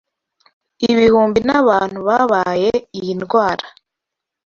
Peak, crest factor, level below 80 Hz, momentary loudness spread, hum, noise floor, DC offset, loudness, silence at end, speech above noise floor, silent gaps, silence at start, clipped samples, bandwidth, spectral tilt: -2 dBFS; 16 dB; -50 dBFS; 10 LU; none; -82 dBFS; under 0.1%; -16 LUFS; 0.8 s; 67 dB; none; 0.8 s; under 0.1%; 7.2 kHz; -6 dB/octave